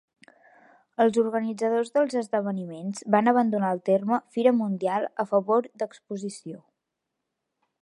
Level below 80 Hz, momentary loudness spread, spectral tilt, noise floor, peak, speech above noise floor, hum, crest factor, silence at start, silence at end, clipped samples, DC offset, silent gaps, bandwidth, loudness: -80 dBFS; 13 LU; -6.5 dB/octave; -83 dBFS; -4 dBFS; 58 dB; none; 22 dB; 1 s; 1.25 s; under 0.1%; under 0.1%; none; 11.5 kHz; -25 LUFS